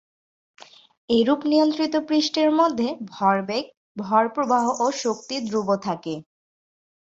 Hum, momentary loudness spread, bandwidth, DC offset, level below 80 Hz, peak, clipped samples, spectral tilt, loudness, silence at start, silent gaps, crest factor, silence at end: none; 9 LU; 7.8 kHz; under 0.1%; -66 dBFS; -6 dBFS; under 0.1%; -4.5 dB/octave; -22 LUFS; 0.6 s; 0.97-1.08 s, 3.77-3.95 s; 18 dB; 0.8 s